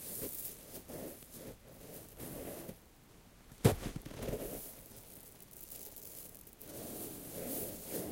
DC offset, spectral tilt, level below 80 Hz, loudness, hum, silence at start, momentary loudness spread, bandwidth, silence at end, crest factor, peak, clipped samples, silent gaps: under 0.1%; -5 dB/octave; -58 dBFS; -42 LUFS; none; 0 s; 14 LU; 17 kHz; 0 s; 32 dB; -12 dBFS; under 0.1%; none